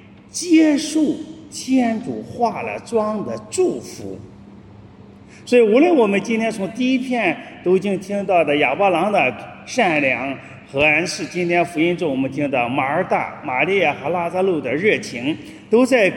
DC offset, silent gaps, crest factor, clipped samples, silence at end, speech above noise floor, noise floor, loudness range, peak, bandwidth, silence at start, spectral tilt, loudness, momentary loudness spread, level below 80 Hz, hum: under 0.1%; none; 18 dB; under 0.1%; 0 s; 24 dB; -42 dBFS; 5 LU; -2 dBFS; 17 kHz; 0.35 s; -5 dB/octave; -18 LUFS; 13 LU; -58 dBFS; none